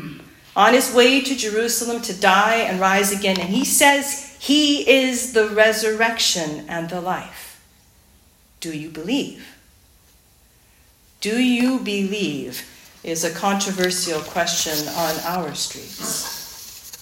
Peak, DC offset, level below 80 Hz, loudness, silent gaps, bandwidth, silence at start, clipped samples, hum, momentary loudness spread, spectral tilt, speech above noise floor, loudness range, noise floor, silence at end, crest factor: 0 dBFS; under 0.1%; -58 dBFS; -19 LUFS; none; 16.5 kHz; 0 s; under 0.1%; none; 16 LU; -2.5 dB/octave; 35 dB; 13 LU; -54 dBFS; 0 s; 20 dB